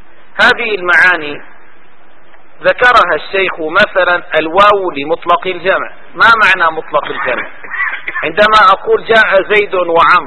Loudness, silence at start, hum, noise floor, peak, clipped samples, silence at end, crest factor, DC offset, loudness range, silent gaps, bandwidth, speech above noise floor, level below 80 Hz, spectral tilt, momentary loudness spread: -10 LUFS; 0.35 s; none; -45 dBFS; 0 dBFS; 0.5%; 0 s; 12 dB; 4%; 2 LU; none; 11 kHz; 34 dB; -42 dBFS; -4 dB/octave; 10 LU